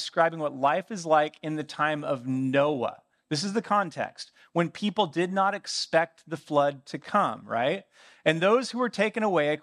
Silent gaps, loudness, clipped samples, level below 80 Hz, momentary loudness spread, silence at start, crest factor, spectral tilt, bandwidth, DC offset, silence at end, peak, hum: none; -27 LUFS; under 0.1%; -80 dBFS; 8 LU; 0 s; 20 dB; -5 dB/octave; 11.5 kHz; under 0.1%; 0.05 s; -8 dBFS; none